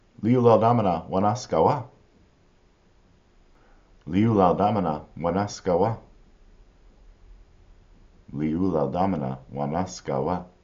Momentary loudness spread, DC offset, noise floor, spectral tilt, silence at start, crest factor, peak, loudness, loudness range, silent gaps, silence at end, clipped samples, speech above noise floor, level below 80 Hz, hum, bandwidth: 11 LU; under 0.1%; -59 dBFS; -7.5 dB/octave; 0.2 s; 20 dB; -4 dBFS; -24 LUFS; 6 LU; none; 0.15 s; under 0.1%; 36 dB; -52 dBFS; none; 7.4 kHz